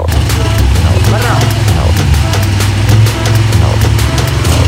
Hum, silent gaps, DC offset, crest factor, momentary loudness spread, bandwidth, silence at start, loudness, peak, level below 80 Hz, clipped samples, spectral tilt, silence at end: none; none; under 0.1%; 8 dB; 2 LU; 16.5 kHz; 0 s; -10 LUFS; 0 dBFS; -16 dBFS; 0.6%; -5 dB/octave; 0 s